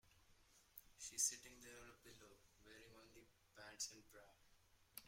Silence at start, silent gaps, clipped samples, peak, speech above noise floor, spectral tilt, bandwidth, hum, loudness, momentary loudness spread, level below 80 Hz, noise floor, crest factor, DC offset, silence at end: 0.05 s; none; under 0.1%; -26 dBFS; 22 dB; 0 dB/octave; 16.5 kHz; none; -47 LUFS; 26 LU; -78 dBFS; -74 dBFS; 28 dB; under 0.1%; 0 s